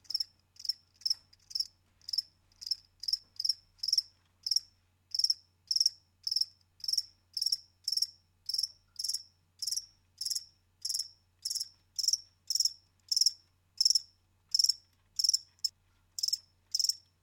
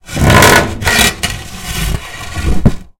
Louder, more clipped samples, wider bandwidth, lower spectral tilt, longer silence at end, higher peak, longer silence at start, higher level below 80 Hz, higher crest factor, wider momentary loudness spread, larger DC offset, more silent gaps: second, -32 LUFS vs -11 LUFS; second, under 0.1% vs 1%; second, 17.5 kHz vs over 20 kHz; second, 4 dB/octave vs -3.5 dB/octave; about the same, 0.25 s vs 0.15 s; second, -12 dBFS vs 0 dBFS; about the same, 0.1 s vs 0.05 s; second, -78 dBFS vs -22 dBFS; first, 22 dB vs 12 dB; second, 12 LU vs 16 LU; neither; neither